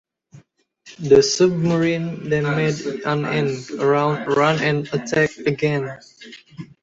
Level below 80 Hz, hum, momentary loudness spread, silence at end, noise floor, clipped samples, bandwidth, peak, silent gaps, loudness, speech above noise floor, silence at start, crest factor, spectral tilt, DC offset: -56 dBFS; none; 16 LU; 0.2 s; -53 dBFS; under 0.1%; 8 kHz; -2 dBFS; none; -19 LUFS; 33 dB; 0.35 s; 18 dB; -5.5 dB/octave; under 0.1%